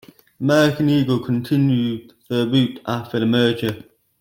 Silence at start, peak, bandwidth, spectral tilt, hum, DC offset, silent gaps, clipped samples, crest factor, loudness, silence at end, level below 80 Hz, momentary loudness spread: 0.4 s; -4 dBFS; 17 kHz; -6.5 dB/octave; none; under 0.1%; none; under 0.1%; 16 dB; -19 LUFS; 0.4 s; -58 dBFS; 10 LU